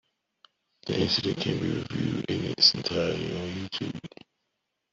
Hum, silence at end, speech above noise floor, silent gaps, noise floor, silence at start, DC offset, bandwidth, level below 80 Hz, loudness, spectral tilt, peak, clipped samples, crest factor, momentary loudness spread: none; 0.85 s; 53 dB; none; -81 dBFS; 0.85 s; under 0.1%; 7.8 kHz; -60 dBFS; -27 LUFS; -5 dB/octave; -6 dBFS; under 0.1%; 24 dB; 15 LU